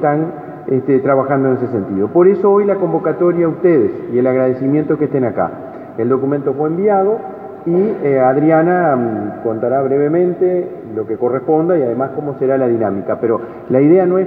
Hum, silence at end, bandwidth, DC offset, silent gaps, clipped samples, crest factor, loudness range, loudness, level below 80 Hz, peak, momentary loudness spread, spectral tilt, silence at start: none; 0 s; 3.7 kHz; under 0.1%; none; under 0.1%; 14 dB; 3 LU; -15 LUFS; -60 dBFS; 0 dBFS; 9 LU; -12 dB/octave; 0 s